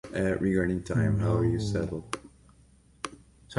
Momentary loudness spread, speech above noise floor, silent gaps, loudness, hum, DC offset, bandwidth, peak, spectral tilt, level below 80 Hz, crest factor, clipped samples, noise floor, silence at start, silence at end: 15 LU; 32 dB; none; -28 LUFS; none; under 0.1%; 11.5 kHz; -12 dBFS; -7 dB/octave; -46 dBFS; 18 dB; under 0.1%; -59 dBFS; 0.05 s; 0 s